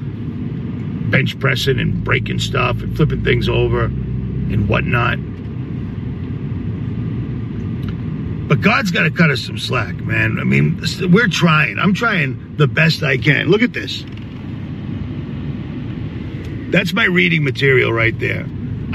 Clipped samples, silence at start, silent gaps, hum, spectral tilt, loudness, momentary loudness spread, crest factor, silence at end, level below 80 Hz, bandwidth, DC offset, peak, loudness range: under 0.1%; 0 s; none; none; -6.5 dB/octave; -17 LUFS; 12 LU; 18 dB; 0 s; -34 dBFS; 13 kHz; under 0.1%; 0 dBFS; 7 LU